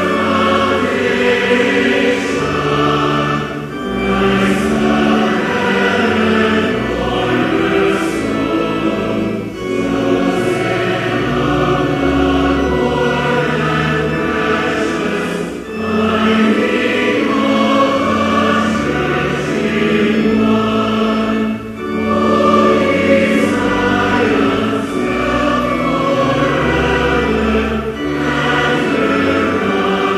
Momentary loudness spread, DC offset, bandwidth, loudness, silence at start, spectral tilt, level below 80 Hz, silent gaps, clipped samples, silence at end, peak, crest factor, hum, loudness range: 5 LU; under 0.1%; 14 kHz; -14 LUFS; 0 s; -6 dB/octave; -34 dBFS; none; under 0.1%; 0 s; 0 dBFS; 14 dB; none; 2 LU